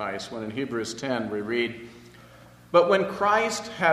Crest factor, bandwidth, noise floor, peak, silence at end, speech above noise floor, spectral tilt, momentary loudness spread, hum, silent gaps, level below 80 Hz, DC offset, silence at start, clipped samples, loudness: 22 dB; 13.5 kHz; -50 dBFS; -4 dBFS; 0 s; 25 dB; -4 dB/octave; 12 LU; 60 Hz at -55 dBFS; none; -62 dBFS; under 0.1%; 0 s; under 0.1%; -25 LUFS